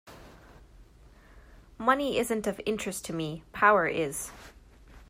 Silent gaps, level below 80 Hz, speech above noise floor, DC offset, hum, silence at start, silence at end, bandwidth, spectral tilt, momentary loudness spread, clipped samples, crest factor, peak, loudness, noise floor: none; -56 dBFS; 27 dB; under 0.1%; none; 0.05 s; 0.05 s; 16 kHz; -4 dB/octave; 14 LU; under 0.1%; 22 dB; -8 dBFS; -28 LUFS; -55 dBFS